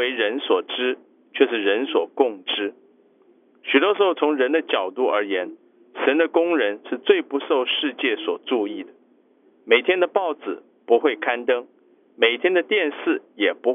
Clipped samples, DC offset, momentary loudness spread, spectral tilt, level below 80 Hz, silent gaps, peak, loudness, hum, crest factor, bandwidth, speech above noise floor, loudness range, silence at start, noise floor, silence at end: under 0.1%; under 0.1%; 9 LU; -5.5 dB/octave; under -90 dBFS; none; -2 dBFS; -21 LUFS; none; 20 dB; 3.8 kHz; 37 dB; 2 LU; 0 s; -58 dBFS; 0 s